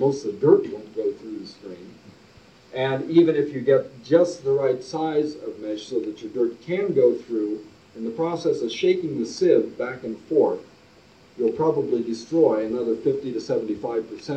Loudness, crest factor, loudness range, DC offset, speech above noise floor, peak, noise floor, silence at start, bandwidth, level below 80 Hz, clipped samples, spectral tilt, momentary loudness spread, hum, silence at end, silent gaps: -23 LUFS; 20 dB; 3 LU; under 0.1%; 30 dB; -2 dBFS; -52 dBFS; 0 s; 8.6 kHz; -66 dBFS; under 0.1%; -6.5 dB/octave; 13 LU; none; 0 s; none